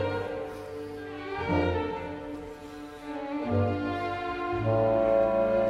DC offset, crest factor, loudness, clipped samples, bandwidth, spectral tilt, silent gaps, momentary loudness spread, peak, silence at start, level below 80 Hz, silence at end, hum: under 0.1%; 14 dB; -29 LUFS; under 0.1%; 11.5 kHz; -8 dB/octave; none; 15 LU; -14 dBFS; 0 s; -50 dBFS; 0 s; none